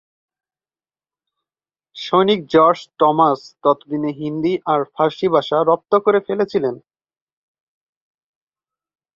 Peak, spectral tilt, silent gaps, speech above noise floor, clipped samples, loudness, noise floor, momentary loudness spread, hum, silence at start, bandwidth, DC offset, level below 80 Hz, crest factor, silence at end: -2 dBFS; -7 dB/octave; none; over 73 dB; under 0.1%; -17 LUFS; under -90 dBFS; 9 LU; none; 1.95 s; 7.2 kHz; under 0.1%; -64 dBFS; 18 dB; 2.4 s